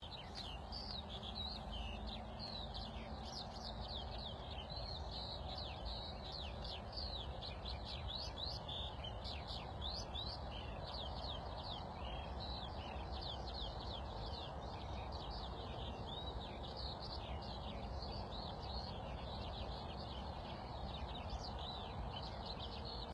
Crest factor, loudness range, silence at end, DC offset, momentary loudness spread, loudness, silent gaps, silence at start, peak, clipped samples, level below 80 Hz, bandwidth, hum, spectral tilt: 16 dB; 2 LU; 0 s; under 0.1%; 3 LU; -47 LUFS; none; 0 s; -32 dBFS; under 0.1%; -52 dBFS; 11.5 kHz; none; -5.5 dB/octave